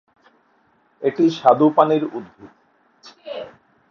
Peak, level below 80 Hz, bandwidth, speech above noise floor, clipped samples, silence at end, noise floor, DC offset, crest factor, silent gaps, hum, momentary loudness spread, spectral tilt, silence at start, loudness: 0 dBFS; -70 dBFS; 6.8 kHz; 43 dB; under 0.1%; 0.4 s; -60 dBFS; under 0.1%; 20 dB; none; none; 20 LU; -7.5 dB/octave; 1 s; -17 LUFS